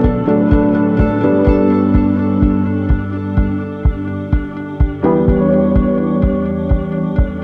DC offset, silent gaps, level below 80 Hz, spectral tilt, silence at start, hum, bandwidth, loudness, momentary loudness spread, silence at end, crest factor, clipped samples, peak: under 0.1%; none; -20 dBFS; -11 dB/octave; 0 s; none; 4.7 kHz; -15 LUFS; 6 LU; 0 s; 14 dB; under 0.1%; 0 dBFS